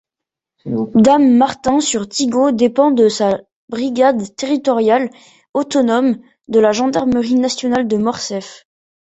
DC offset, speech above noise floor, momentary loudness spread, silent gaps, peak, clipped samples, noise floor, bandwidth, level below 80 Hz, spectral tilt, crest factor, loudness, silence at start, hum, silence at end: under 0.1%; 70 dB; 12 LU; 3.56-3.68 s, 5.49-5.54 s; -2 dBFS; under 0.1%; -84 dBFS; 8.2 kHz; -54 dBFS; -4.5 dB/octave; 14 dB; -15 LUFS; 0.65 s; none; 0.45 s